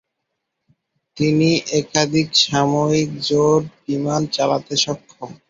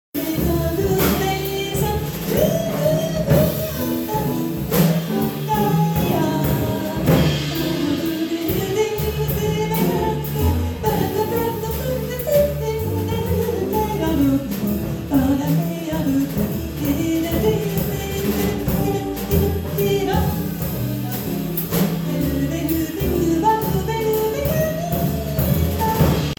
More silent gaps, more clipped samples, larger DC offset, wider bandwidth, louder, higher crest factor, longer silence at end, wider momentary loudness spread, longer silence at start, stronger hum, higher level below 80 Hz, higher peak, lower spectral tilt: neither; neither; neither; second, 7.8 kHz vs over 20 kHz; about the same, -18 LUFS vs -20 LUFS; about the same, 18 dB vs 16 dB; about the same, 0.15 s vs 0.05 s; about the same, 7 LU vs 5 LU; first, 1.15 s vs 0.15 s; neither; second, -56 dBFS vs -34 dBFS; about the same, -2 dBFS vs -4 dBFS; second, -4.5 dB/octave vs -6 dB/octave